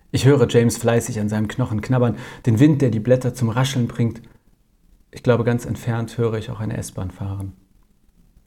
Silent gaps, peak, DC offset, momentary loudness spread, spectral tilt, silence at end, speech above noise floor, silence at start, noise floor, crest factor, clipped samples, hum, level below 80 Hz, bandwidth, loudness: none; -2 dBFS; under 0.1%; 13 LU; -6.5 dB/octave; 0.95 s; 38 dB; 0.15 s; -57 dBFS; 18 dB; under 0.1%; none; -48 dBFS; 15.5 kHz; -20 LUFS